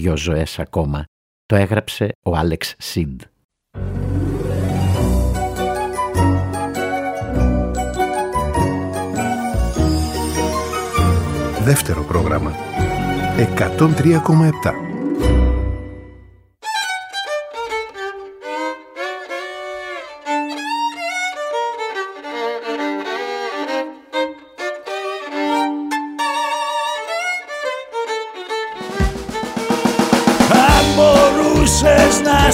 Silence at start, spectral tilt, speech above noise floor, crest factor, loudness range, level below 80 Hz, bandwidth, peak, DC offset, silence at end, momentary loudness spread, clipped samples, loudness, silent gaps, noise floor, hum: 0 s; -5 dB/octave; 28 dB; 18 dB; 8 LU; -28 dBFS; 16 kHz; 0 dBFS; under 0.1%; 0 s; 14 LU; under 0.1%; -18 LUFS; 1.08-1.49 s, 2.15-2.22 s, 3.44-3.49 s; -45 dBFS; none